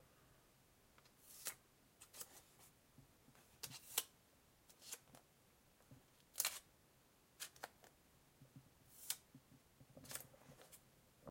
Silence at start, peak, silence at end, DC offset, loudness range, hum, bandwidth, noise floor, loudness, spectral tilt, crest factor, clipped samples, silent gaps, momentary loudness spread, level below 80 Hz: 0 s; -18 dBFS; 0 s; under 0.1%; 7 LU; none; 16.5 kHz; -73 dBFS; -49 LUFS; -0.5 dB/octave; 38 dB; under 0.1%; none; 24 LU; -82 dBFS